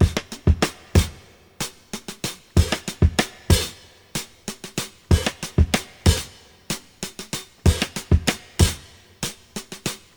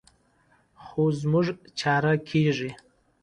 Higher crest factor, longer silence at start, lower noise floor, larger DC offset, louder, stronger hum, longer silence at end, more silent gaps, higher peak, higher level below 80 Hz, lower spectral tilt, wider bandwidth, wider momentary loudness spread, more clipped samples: about the same, 22 dB vs 18 dB; second, 0 s vs 0.8 s; second, -47 dBFS vs -64 dBFS; neither; first, -23 LUFS vs -26 LUFS; neither; second, 0.2 s vs 0.5 s; neither; first, -2 dBFS vs -10 dBFS; first, -28 dBFS vs -62 dBFS; second, -4.5 dB/octave vs -6.5 dB/octave; first, over 20 kHz vs 10 kHz; first, 12 LU vs 8 LU; neither